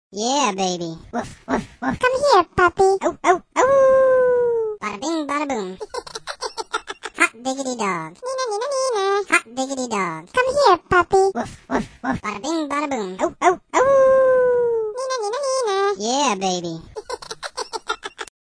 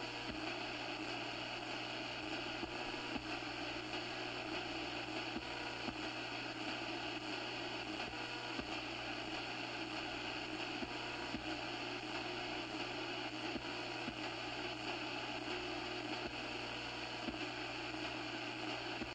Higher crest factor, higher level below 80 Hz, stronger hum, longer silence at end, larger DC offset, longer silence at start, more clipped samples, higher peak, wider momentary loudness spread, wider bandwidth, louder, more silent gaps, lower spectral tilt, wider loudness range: about the same, 20 dB vs 18 dB; first, -50 dBFS vs -66 dBFS; second, none vs 60 Hz at -60 dBFS; first, 0.25 s vs 0 s; neither; about the same, 0.1 s vs 0 s; neither; first, -2 dBFS vs -26 dBFS; first, 14 LU vs 1 LU; second, 10.5 kHz vs 16 kHz; first, -20 LUFS vs -43 LUFS; neither; about the same, -3.5 dB/octave vs -3.5 dB/octave; first, 7 LU vs 0 LU